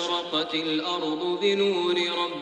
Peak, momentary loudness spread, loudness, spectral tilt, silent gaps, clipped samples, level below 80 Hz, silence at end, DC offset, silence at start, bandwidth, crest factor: -10 dBFS; 4 LU; -25 LUFS; -4 dB/octave; none; under 0.1%; -70 dBFS; 0 s; under 0.1%; 0 s; 9.6 kHz; 16 dB